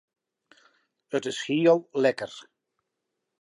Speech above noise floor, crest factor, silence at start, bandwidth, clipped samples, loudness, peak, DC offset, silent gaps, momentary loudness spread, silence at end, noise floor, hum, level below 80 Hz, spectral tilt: 58 dB; 20 dB; 1.1 s; 11 kHz; under 0.1%; -25 LUFS; -8 dBFS; under 0.1%; none; 16 LU; 1 s; -83 dBFS; none; -80 dBFS; -5 dB/octave